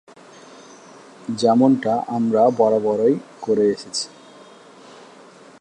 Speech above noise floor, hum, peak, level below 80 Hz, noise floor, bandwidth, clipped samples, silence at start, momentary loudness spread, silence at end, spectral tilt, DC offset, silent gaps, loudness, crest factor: 27 dB; none; -4 dBFS; -70 dBFS; -45 dBFS; 10.5 kHz; under 0.1%; 1.25 s; 11 LU; 1.55 s; -5.5 dB/octave; under 0.1%; none; -19 LUFS; 18 dB